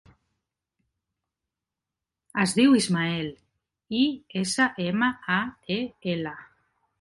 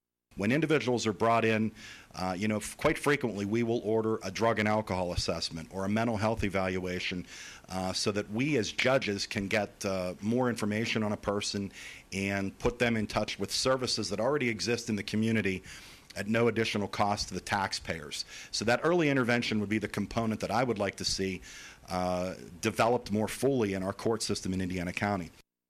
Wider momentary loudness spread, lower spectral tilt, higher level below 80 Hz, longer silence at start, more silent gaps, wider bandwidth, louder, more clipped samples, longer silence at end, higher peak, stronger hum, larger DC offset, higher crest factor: first, 12 LU vs 9 LU; about the same, -4.5 dB/octave vs -4.5 dB/octave; second, -64 dBFS vs -54 dBFS; first, 2.35 s vs 0.35 s; neither; second, 11.5 kHz vs 15 kHz; first, -25 LUFS vs -31 LUFS; neither; first, 0.55 s vs 0.4 s; first, -8 dBFS vs -16 dBFS; neither; neither; about the same, 18 dB vs 16 dB